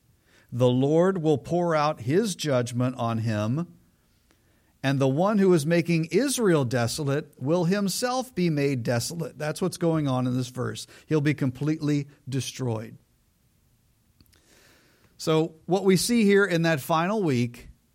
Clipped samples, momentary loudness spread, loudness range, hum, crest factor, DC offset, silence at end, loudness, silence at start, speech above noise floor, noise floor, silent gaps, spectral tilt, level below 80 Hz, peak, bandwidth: under 0.1%; 10 LU; 7 LU; none; 16 dB; under 0.1%; 0.25 s; -25 LUFS; 0.5 s; 41 dB; -65 dBFS; none; -6 dB/octave; -62 dBFS; -8 dBFS; 16.5 kHz